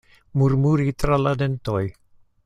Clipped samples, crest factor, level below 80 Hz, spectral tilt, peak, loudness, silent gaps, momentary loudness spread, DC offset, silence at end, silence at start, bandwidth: under 0.1%; 18 dB; -40 dBFS; -8 dB/octave; -4 dBFS; -22 LUFS; none; 8 LU; under 0.1%; 0.55 s; 0.35 s; 11.5 kHz